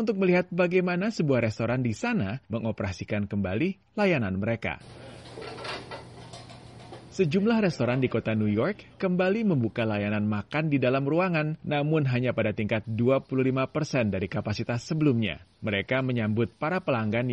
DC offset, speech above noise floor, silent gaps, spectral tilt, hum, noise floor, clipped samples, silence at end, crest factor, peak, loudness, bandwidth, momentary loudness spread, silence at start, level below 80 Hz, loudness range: under 0.1%; 20 dB; none; -7.5 dB/octave; none; -46 dBFS; under 0.1%; 0 s; 16 dB; -12 dBFS; -27 LUFS; 10.5 kHz; 14 LU; 0 s; -58 dBFS; 5 LU